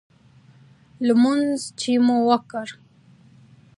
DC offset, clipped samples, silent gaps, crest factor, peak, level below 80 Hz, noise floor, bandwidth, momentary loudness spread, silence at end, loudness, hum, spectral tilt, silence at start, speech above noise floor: under 0.1%; under 0.1%; none; 20 dB; -2 dBFS; -70 dBFS; -52 dBFS; 11.5 kHz; 15 LU; 1.05 s; -21 LUFS; none; -4.5 dB/octave; 1 s; 33 dB